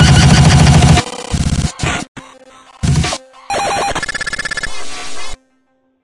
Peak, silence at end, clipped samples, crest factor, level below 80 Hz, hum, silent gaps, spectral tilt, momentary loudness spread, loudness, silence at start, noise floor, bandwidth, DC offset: 0 dBFS; 0.7 s; 0.1%; 14 dB; -24 dBFS; none; 2.08-2.15 s; -5 dB/octave; 18 LU; -13 LUFS; 0 s; -59 dBFS; 11.5 kHz; under 0.1%